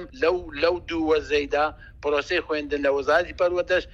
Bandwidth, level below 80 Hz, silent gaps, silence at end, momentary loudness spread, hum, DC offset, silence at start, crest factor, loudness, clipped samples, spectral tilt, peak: 7.8 kHz; -46 dBFS; none; 0.05 s; 5 LU; none; under 0.1%; 0 s; 18 dB; -24 LUFS; under 0.1%; -4.5 dB/octave; -6 dBFS